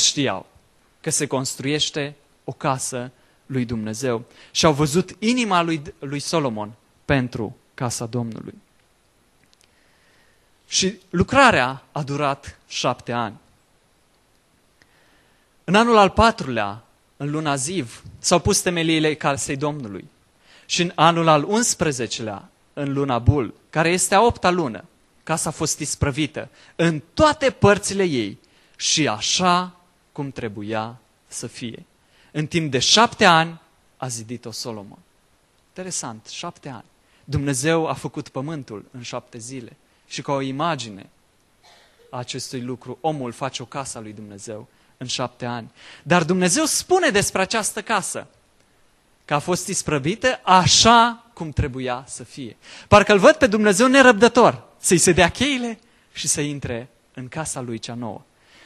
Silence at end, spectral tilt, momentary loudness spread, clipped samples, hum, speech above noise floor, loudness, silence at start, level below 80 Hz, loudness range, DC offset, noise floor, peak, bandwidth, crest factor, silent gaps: 0.5 s; -3.5 dB/octave; 20 LU; under 0.1%; none; 40 dB; -20 LUFS; 0 s; -46 dBFS; 13 LU; under 0.1%; -60 dBFS; 0 dBFS; 13 kHz; 22 dB; none